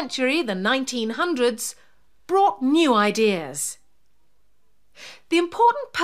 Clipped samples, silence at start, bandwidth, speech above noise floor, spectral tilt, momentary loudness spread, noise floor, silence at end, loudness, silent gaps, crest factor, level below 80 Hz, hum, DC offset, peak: under 0.1%; 0 s; 15.5 kHz; 48 dB; -3.5 dB/octave; 11 LU; -70 dBFS; 0 s; -21 LUFS; none; 18 dB; -68 dBFS; none; 0.3%; -6 dBFS